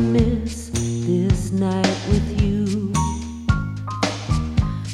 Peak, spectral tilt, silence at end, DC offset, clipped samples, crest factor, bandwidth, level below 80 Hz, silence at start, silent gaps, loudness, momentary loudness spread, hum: -2 dBFS; -6 dB/octave; 0 s; under 0.1%; under 0.1%; 18 dB; 13.5 kHz; -30 dBFS; 0 s; none; -22 LUFS; 6 LU; none